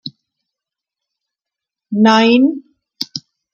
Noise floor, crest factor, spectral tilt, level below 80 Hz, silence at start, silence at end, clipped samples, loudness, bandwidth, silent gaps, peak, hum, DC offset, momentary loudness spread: -85 dBFS; 16 dB; -5 dB/octave; -68 dBFS; 0.05 s; 0.35 s; under 0.1%; -13 LUFS; 15.5 kHz; none; 0 dBFS; none; under 0.1%; 20 LU